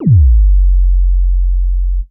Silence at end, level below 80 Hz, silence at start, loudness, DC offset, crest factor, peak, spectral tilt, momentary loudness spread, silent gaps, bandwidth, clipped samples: 0.05 s; -10 dBFS; 0 s; -13 LUFS; under 0.1%; 8 dB; -2 dBFS; -18 dB/octave; 8 LU; none; 0.7 kHz; under 0.1%